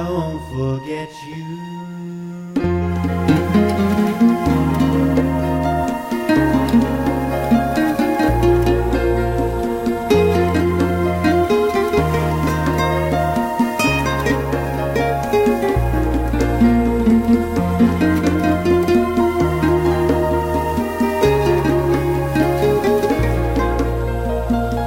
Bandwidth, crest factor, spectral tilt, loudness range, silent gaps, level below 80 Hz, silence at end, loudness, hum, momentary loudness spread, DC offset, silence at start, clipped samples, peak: 16 kHz; 14 dB; -7 dB/octave; 2 LU; none; -28 dBFS; 0 s; -17 LUFS; none; 7 LU; under 0.1%; 0 s; under 0.1%; -4 dBFS